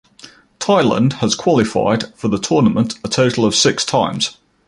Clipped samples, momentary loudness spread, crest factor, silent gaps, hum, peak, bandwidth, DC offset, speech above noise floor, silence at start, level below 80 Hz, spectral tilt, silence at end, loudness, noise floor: under 0.1%; 7 LU; 14 dB; none; none; -2 dBFS; 11.5 kHz; under 0.1%; 28 dB; 0.25 s; -48 dBFS; -4.5 dB/octave; 0.35 s; -16 LUFS; -43 dBFS